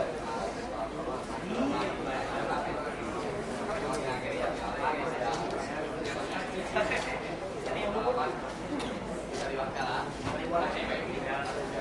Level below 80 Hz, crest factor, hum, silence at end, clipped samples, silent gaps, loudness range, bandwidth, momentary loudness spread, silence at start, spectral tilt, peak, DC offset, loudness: -52 dBFS; 18 dB; none; 0 s; under 0.1%; none; 1 LU; 11.5 kHz; 5 LU; 0 s; -5 dB/octave; -16 dBFS; under 0.1%; -33 LUFS